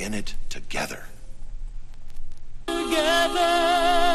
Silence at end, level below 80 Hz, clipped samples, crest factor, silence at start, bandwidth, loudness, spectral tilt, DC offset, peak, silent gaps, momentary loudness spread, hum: 0 s; -34 dBFS; under 0.1%; 14 dB; 0 s; 13.5 kHz; -23 LUFS; -3 dB/octave; under 0.1%; -8 dBFS; none; 23 LU; none